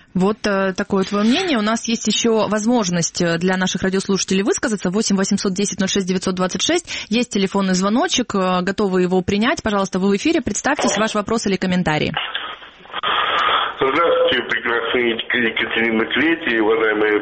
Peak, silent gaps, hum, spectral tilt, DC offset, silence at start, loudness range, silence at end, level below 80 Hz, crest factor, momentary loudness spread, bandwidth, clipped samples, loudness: -4 dBFS; none; none; -4 dB/octave; under 0.1%; 0.15 s; 2 LU; 0 s; -48 dBFS; 16 dB; 4 LU; 8.8 kHz; under 0.1%; -18 LUFS